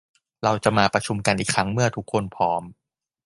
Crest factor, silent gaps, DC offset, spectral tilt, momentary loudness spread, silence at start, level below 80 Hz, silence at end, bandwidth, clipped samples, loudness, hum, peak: 22 dB; none; under 0.1%; -4.5 dB/octave; 7 LU; 0.4 s; -52 dBFS; 0.55 s; 11.5 kHz; under 0.1%; -23 LUFS; none; -2 dBFS